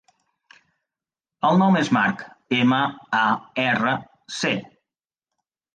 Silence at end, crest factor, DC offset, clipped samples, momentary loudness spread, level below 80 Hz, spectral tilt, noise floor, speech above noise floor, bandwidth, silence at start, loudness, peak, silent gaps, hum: 1.1 s; 18 dB; under 0.1%; under 0.1%; 10 LU; -66 dBFS; -5.5 dB/octave; -90 dBFS; 69 dB; 9.2 kHz; 1.45 s; -21 LUFS; -6 dBFS; none; none